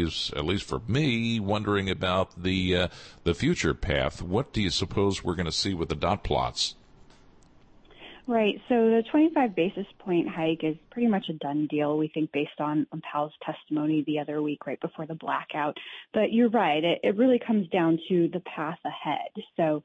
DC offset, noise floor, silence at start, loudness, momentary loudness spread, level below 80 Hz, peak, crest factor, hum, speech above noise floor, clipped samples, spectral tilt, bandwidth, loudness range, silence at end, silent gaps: under 0.1%; -56 dBFS; 0 s; -27 LUFS; 9 LU; -48 dBFS; -12 dBFS; 14 dB; none; 29 dB; under 0.1%; -5.5 dB/octave; 8.8 kHz; 5 LU; 0.05 s; none